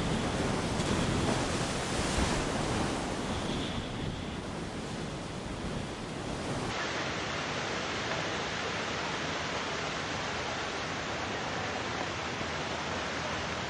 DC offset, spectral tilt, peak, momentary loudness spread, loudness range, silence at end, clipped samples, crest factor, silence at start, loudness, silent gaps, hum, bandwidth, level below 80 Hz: under 0.1%; -4 dB/octave; -16 dBFS; 7 LU; 5 LU; 0 s; under 0.1%; 18 dB; 0 s; -33 LUFS; none; none; 11.5 kHz; -46 dBFS